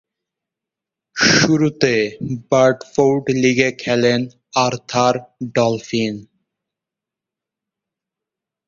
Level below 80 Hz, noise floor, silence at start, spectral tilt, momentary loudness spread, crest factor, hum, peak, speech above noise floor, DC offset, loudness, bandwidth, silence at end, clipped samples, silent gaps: -54 dBFS; -86 dBFS; 1.15 s; -4.5 dB/octave; 10 LU; 18 dB; none; 0 dBFS; 69 dB; under 0.1%; -17 LUFS; 7.6 kHz; 2.45 s; under 0.1%; none